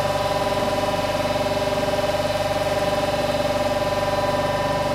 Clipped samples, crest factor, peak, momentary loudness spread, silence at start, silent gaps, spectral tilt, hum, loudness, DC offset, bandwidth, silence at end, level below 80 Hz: under 0.1%; 12 dB; -10 dBFS; 1 LU; 0 s; none; -4.5 dB/octave; 50 Hz at -35 dBFS; -22 LUFS; under 0.1%; 16 kHz; 0 s; -40 dBFS